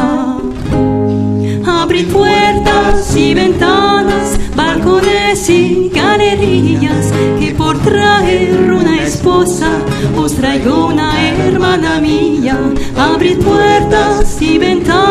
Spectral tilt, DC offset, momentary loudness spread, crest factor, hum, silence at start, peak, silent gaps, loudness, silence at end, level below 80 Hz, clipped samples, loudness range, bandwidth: -5.5 dB/octave; under 0.1%; 5 LU; 10 dB; none; 0 s; 0 dBFS; none; -10 LUFS; 0 s; -24 dBFS; under 0.1%; 1 LU; 14.5 kHz